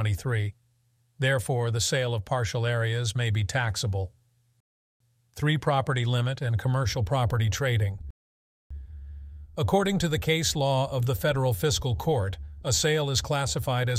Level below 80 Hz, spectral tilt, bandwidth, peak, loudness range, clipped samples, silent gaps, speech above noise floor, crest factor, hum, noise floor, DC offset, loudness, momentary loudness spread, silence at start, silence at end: -46 dBFS; -4.5 dB/octave; 16 kHz; -10 dBFS; 3 LU; under 0.1%; 4.60-5.00 s, 8.10-8.70 s; 42 dB; 18 dB; none; -68 dBFS; under 0.1%; -27 LUFS; 11 LU; 0 s; 0 s